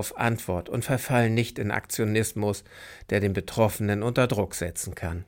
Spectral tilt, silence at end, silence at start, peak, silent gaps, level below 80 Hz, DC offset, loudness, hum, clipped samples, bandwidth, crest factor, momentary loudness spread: -5.5 dB/octave; 0.05 s; 0 s; -8 dBFS; none; -50 dBFS; under 0.1%; -27 LUFS; none; under 0.1%; 17 kHz; 18 dB; 8 LU